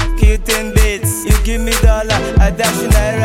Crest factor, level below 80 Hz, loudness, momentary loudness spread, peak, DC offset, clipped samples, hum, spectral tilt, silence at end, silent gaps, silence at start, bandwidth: 12 dB; -14 dBFS; -14 LUFS; 3 LU; 0 dBFS; under 0.1%; under 0.1%; none; -4.5 dB/octave; 0 s; none; 0 s; 16.5 kHz